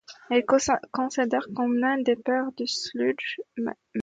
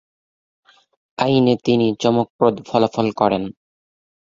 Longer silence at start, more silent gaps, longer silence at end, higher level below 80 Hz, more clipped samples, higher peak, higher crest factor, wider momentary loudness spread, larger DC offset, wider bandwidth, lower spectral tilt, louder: second, 0.1 s vs 1.2 s; second, none vs 2.30-2.39 s; second, 0 s vs 0.7 s; second, -62 dBFS vs -56 dBFS; neither; second, -8 dBFS vs -2 dBFS; about the same, 18 dB vs 18 dB; about the same, 9 LU vs 7 LU; neither; first, 9.2 kHz vs 7.6 kHz; second, -3.5 dB/octave vs -6.5 dB/octave; second, -26 LUFS vs -18 LUFS